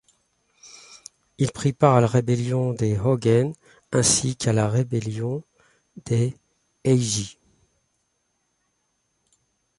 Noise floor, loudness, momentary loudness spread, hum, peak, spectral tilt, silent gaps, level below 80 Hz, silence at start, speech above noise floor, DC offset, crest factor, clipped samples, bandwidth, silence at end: -72 dBFS; -22 LUFS; 16 LU; none; -4 dBFS; -5.5 dB/octave; none; -54 dBFS; 0.65 s; 51 dB; under 0.1%; 22 dB; under 0.1%; 11.5 kHz; 2.45 s